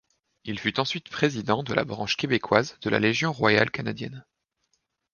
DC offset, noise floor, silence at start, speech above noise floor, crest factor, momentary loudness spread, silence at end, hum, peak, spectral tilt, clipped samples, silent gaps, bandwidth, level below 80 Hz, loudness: under 0.1%; -75 dBFS; 0.45 s; 49 dB; 24 dB; 12 LU; 0.95 s; none; -2 dBFS; -5 dB/octave; under 0.1%; none; 7.2 kHz; -60 dBFS; -25 LUFS